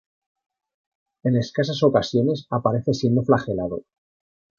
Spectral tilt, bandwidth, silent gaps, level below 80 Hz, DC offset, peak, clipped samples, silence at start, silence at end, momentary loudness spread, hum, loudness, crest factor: -7 dB/octave; 7.2 kHz; none; -54 dBFS; under 0.1%; -2 dBFS; under 0.1%; 1.25 s; 0.8 s; 8 LU; none; -22 LUFS; 20 dB